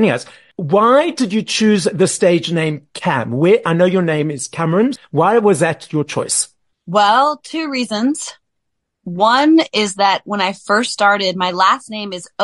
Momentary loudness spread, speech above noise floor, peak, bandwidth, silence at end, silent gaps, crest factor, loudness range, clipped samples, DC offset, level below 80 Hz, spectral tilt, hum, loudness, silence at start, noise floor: 10 LU; 60 dB; -2 dBFS; 11.5 kHz; 0 s; none; 14 dB; 2 LU; under 0.1%; under 0.1%; -62 dBFS; -4.5 dB/octave; none; -15 LUFS; 0 s; -75 dBFS